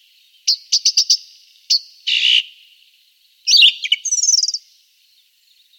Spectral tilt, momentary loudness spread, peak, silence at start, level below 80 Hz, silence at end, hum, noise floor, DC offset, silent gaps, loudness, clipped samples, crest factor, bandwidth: 14.5 dB/octave; 12 LU; 0 dBFS; 0.45 s; under -90 dBFS; 1.2 s; none; -56 dBFS; under 0.1%; none; -14 LUFS; under 0.1%; 18 dB; 17 kHz